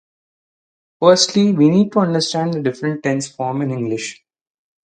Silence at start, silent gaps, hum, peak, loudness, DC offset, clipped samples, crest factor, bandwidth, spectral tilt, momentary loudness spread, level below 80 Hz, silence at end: 1 s; none; none; 0 dBFS; -17 LUFS; under 0.1%; under 0.1%; 18 dB; 9.6 kHz; -5 dB/octave; 10 LU; -64 dBFS; 0.7 s